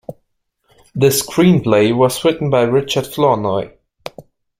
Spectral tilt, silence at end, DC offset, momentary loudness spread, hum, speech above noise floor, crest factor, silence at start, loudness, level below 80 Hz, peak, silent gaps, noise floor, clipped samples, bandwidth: -5.5 dB/octave; 0.4 s; under 0.1%; 21 LU; none; 53 dB; 16 dB; 0.1 s; -15 LUFS; -50 dBFS; 0 dBFS; none; -67 dBFS; under 0.1%; 16.5 kHz